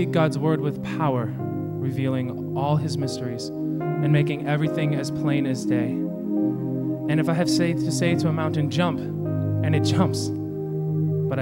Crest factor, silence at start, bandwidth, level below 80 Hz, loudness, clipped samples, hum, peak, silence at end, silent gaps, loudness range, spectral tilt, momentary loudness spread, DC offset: 16 dB; 0 s; 16.5 kHz; -58 dBFS; -24 LUFS; under 0.1%; none; -8 dBFS; 0 s; none; 2 LU; -7 dB/octave; 7 LU; under 0.1%